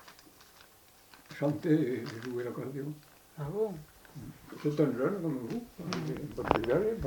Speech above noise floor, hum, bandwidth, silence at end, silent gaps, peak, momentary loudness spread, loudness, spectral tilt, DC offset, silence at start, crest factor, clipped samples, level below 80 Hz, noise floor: 27 dB; none; 19 kHz; 0 s; none; -6 dBFS; 19 LU; -33 LUFS; -7 dB/octave; under 0.1%; 0 s; 28 dB; under 0.1%; -56 dBFS; -59 dBFS